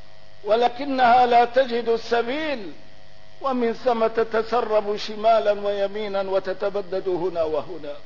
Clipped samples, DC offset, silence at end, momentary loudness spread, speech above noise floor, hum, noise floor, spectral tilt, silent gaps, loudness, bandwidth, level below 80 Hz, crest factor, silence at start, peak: under 0.1%; 2%; 0.05 s; 11 LU; 29 dB; none; -50 dBFS; -5 dB/octave; none; -22 LUFS; 6 kHz; -56 dBFS; 14 dB; 0.45 s; -8 dBFS